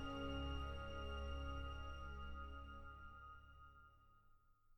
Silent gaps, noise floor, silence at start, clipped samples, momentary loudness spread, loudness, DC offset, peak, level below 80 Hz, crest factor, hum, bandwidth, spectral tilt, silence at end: none; -71 dBFS; 0 s; under 0.1%; 17 LU; -51 LUFS; under 0.1%; -36 dBFS; -52 dBFS; 16 dB; none; 18 kHz; -6.5 dB/octave; 0 s